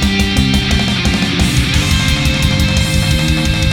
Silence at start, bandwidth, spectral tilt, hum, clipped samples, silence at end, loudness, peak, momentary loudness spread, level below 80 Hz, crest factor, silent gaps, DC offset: 0 s; 18 kHz; -4.5 dB/octave; none; under 0.1%; 0 s; -13 LUFS; 0 dBFS; 1 LU; -18 dBFS; 12 dB; none; under 0.1%